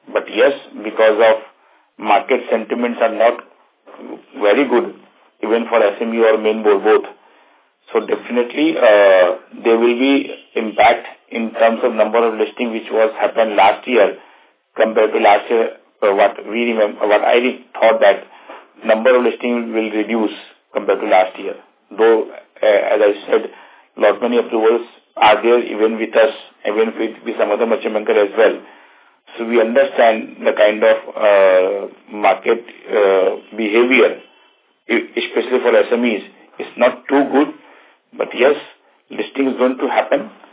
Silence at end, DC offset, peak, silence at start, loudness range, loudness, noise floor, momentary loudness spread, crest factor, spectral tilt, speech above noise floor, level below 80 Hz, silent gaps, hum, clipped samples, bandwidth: 0.25 s; under 0.1%; 0 dBFS; 0.1 s; 3 LU; -15 LUFS; -55 dBFS; 12 LU; 16 dB; -8 dB/octave; 40 dB; -66 dBFS; none; none; under 0.1%; 4 kHz